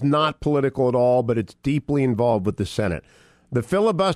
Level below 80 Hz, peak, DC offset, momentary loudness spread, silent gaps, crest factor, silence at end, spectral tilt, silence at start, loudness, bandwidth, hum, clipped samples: -46 dBFS; -8 dBFS; under 0.1%; 7 LU; none; 14 dB; 0 s; -7 dB/octave; 0 s; -22 LUFS; 13 kHz; none; under 0.1%